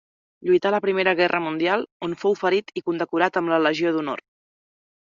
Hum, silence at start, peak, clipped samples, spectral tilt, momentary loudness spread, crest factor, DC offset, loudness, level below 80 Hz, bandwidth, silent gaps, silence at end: none; 0.4 s; -4 dBFS; under 0.1%; -3 dB/octave; 9 LU; 20 dB; under 0.1%; -22 LUFS; -68 dBFS; 7.4 kHz; 1.92-2.00 s; 1 s